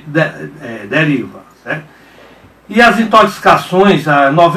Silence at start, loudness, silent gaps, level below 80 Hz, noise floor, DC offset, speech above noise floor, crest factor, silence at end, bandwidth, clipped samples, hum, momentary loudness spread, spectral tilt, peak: 0.05 s; -10 LUFS; none; -46 dBFS; -41 dBFS; under 0.1%; 30 dB; 12 dB; 0 s; 15.5 kHz; 0.4%; none; 16 LU; -6 dB/octave; 0 dBFS